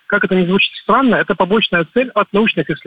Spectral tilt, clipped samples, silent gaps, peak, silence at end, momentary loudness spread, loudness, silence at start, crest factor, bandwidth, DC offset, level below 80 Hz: -8 dB/octave; under 0.1%; none; -2 dBFS; 0.1 s; 3 LU; -14 LUFS; 0.1 s; 12 dB; 5 kHz; 0.2%; -48 dBFS